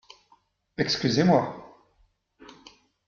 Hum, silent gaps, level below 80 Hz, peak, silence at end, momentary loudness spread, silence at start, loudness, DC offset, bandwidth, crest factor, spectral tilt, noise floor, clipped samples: none; none; -62 dBFS; -8 dBFS; 1.4 s; 20 LU; 0.8 s; -24 LUFS; under 0.1%; 7.2 kHz; 20 dB; -5.5 dB/octave; -66 dBFS; under 0.1%